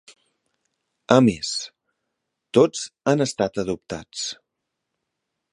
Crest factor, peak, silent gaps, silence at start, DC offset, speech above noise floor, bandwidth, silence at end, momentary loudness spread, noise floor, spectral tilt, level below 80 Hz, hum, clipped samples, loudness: 24 dB; 0 dBFS; none; 1.1 s; under 0.1%; 60 dB; 11.5 kHz; 1.2 s; 14 LU; -81 dBFS; -5 dB/octave; -58 dBFS; none; under 0.1%; -22 LUFS